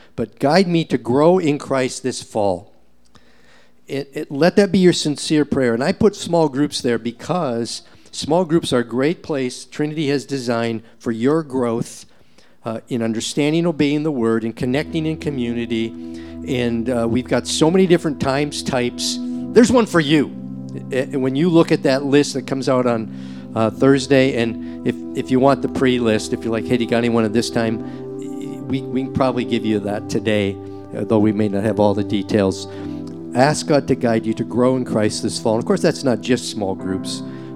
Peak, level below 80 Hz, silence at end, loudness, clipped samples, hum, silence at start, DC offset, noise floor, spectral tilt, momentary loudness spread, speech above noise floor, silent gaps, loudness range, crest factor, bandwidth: 0 dBFS; -50 dBFS; 0 s; -19 LUFS; under 0.1%; none; 0.15 s; 0.5%; -54 dBFS; -5.5 dB/octave; 12 LU; 36 dB; none; 4 LU; 18 dB; 14 kHz